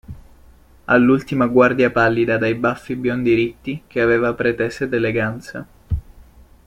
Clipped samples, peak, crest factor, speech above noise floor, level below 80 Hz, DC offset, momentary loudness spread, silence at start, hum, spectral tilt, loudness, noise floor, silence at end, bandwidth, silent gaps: under 0.1%; -2 dBFS; 18 dB; 30 dB; -40 dBFS; under 0.1%; 13 LU; 0.1 s; none; -7.5 dB/octave; -18 LUFS; -47 dBFS; 0.45 s; 11.5 kHz; none